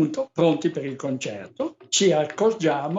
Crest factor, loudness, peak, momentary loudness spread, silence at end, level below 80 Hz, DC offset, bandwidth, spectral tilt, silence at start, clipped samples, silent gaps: 16 dB; -23 LUFS; -8 dBFS; 11 LU; 0 s; -72 dBFS; under 0.1%; 11.5 kHz; -4.5 dB/octave; 0 s; under 0.1%; none